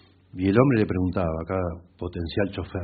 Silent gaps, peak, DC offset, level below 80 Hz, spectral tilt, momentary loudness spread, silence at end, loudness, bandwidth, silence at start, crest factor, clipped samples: none; -4 dBFS; under 0.1%; -48 dBFS; -7 dB/octave; 14 LU; 0 s; -25 LUFS; 4.8 kHz; 0.35 s; 22 dB; under 0.1%